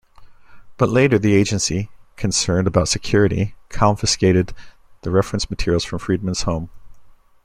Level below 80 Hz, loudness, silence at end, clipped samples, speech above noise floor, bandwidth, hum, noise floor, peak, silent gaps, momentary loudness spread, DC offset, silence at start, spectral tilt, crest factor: -38 dBFS; -19 LUFS; 0.3 s; under 0.1%; 26 dB; 13.5 kHz; none; -44 dBFS; -2 dBFS; none; 11 LU; under 0.1%; 0.2 s; -5 dB/octave; 18 dB